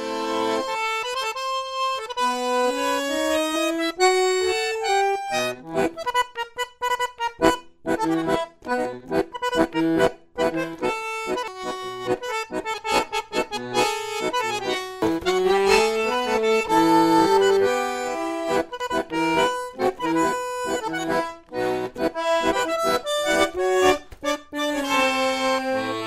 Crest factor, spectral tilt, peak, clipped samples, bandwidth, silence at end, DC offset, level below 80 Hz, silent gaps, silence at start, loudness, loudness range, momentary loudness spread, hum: 22 dB; -3.5 dB/octave; -2 dBFS; under 0.1%; 16 kHz; 0 s; under 0.1%; -52 dBFS; none; 0 s; -23 LUFS; 5 LU; 8 LU; none